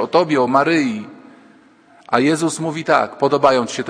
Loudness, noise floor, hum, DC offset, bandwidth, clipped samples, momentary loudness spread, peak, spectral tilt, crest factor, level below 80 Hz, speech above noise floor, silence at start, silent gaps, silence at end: -17 LUFS; -49 dBFS; none; under 0.1%; 10.5 kHz; under 0.1%; 8 LU; 0 dBFS; -5 dB/octave; 18 dB; -62 dBFS; 33 dB; 0 s; none; 0 s